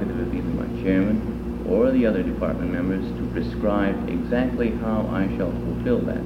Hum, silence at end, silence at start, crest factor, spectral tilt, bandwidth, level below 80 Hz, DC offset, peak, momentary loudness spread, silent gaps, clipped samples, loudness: none; 0 s; 0 s; 14 dB; -9 dB/octave; 10 kHz; -36 dBFS; under 0.1%; -8 dBFS; 6 LU; none; under 0.1%; -24 LUFS